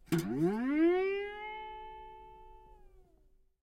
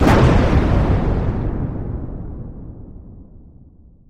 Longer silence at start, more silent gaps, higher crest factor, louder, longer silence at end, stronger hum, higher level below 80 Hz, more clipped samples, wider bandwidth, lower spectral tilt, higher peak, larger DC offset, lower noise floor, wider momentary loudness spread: about the same, 0.1 s vs 0 s; neither; about the same, 16 dB vs 16 dB; second, -33 LUFS vs -18 LUFS; about the same, 0.6 s vs 0.65 s; neither; second, -60 dBFS vs -24 dBFS; neither; first, 16 kHz vs 13 kHz; about the same, -7 dB/octave vs -8 dB/octave; second, -18 dBFS vs -2 dBFS; neither; first, -66 dBFS vs -45 dBFS; about the same, 23 LU vs 24 LU